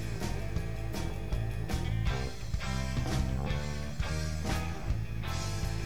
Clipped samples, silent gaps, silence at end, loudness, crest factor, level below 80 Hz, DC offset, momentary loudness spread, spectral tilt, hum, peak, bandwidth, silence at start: under 0.1%; none; 0 s; -35 LUFS; 14 dB; -38 dBFS; 1%; 4 LU; -5.5 dB/octave; none; -20 dBFS; 19 kHz; 0 s